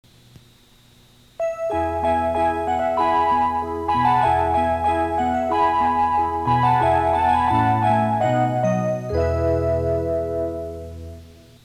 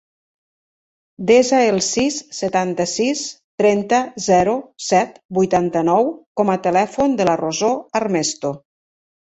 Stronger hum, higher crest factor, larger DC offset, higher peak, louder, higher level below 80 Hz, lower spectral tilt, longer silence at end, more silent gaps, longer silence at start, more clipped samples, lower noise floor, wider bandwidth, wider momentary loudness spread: neither; about the same, 14 dB vs 16 dB; neither; second, -6 dBFS vs -2 dBFS; about the same, -20 LUFS vs -18 LUFS; first, -40 dBFS vs -56 dBFS; first, -7.5 dB/octave vs -4 dB/octave; second, 0.35 s vs 0.8 s; second, none vs 3.44-3.58 s, 5.25-5.29 s, 6.26-6.35 s; first, 1.4 s vs 1.2 s; neither; second, -52 dBFS vs under -90 dBFS; first, 14 kHz vs 8.2 kHz; about the same, 8 LU vs 8 LU